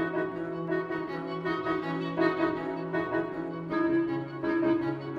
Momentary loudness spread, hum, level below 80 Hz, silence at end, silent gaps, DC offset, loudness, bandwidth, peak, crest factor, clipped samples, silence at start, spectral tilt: 7 LU; none; -62 dBFS; 0 s; none; under 0.1%; -30 LUFS; 5.8 kHz; -14 dBFS; 16 dB; under 0.1%; 0 s; -8.5 dB/octave